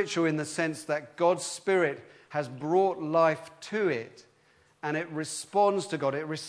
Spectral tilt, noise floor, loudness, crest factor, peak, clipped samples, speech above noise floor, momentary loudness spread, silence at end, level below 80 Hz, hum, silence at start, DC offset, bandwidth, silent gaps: -4.5 dB/octave; -64 dBFS; -29 LUFS; 18 dB; -12 dBFS; under 0.1%; 36 dB; 10 LU; 0 s; -80 dBFS; none; 0 s; under 0.1%; 11 kHz; none